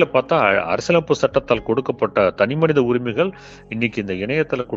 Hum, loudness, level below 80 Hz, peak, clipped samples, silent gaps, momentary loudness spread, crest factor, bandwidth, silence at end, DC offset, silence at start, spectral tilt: none; -19 LUFS; -48 dBFS; -2 dBFS; under 0.1%; none; 6 LU; 18 dB; 7.8 kHz; 0 s; under 0.1%; 0 s; -6 dB/octave